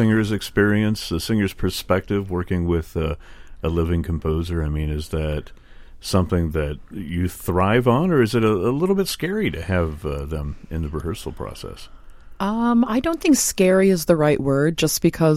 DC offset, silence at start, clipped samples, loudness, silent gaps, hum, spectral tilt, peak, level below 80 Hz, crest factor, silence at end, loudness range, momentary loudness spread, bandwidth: under 0.1%; 0 s; under 0.1%; -21 LUFS; none; none; -5.5 dB/octave; -2 dBFS; -34 dBFS; 20 dB; 0 s; 6 LU; 12 LU; 16.5 kHz